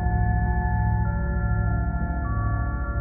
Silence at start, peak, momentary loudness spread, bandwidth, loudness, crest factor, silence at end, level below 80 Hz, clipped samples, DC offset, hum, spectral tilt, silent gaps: 0 s; -12 dBFS; 4 LU; 2.4 kHz; -25 LUFS; 12 dB; 0 s; -26 dBFS; under 0.1%; under 0.1%; none; -6 dB/octave; none